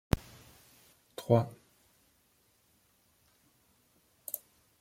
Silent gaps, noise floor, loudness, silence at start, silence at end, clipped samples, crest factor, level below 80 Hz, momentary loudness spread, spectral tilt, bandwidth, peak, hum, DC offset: none; -70 dBFS; -34 LUFS; 0.15 s; 0.45 s; under 0.1%; 28 dB; -52 dBFS; 27 LU; -7 dB/octave; 16.5 kHz; -10 dBFS; none; under 0.1%